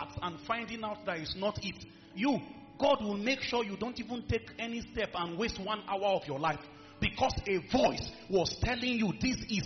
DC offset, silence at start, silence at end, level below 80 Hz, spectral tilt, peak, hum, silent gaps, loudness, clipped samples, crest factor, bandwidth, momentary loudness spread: under 0.1%; 0 s; 0 s; -52 dBFS; -3.5 dB/octave; -16 dBFS; none; none; -33 LUFS; under 0.1%; 18 dB; 6.4 kHz; 10 LU